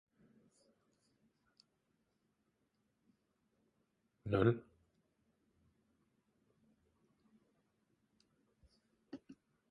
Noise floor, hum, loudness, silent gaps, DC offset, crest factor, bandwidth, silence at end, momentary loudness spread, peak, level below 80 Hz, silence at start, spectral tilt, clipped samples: -82 dBFS; none; -36 LUFS; none; under 0.1%; 28 dB; 9.8 kHz; 0.4 s; 23 LU; -20 dBFS; -70 dBFS; 4.25 s; -9 dB/octave; under 0.1%